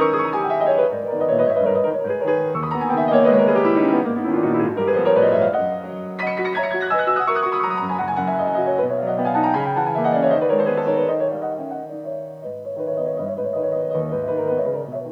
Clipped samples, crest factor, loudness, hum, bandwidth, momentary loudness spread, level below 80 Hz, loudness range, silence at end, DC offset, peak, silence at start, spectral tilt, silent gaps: under 0.1%; 18 dB; -20 LUFS; none; 5.8 kHz; 11 LU; -62 dBFS; 7 LU; 0 s; under 0.1%; -2 dBFS; 0 s; -8.5 dB/octave; none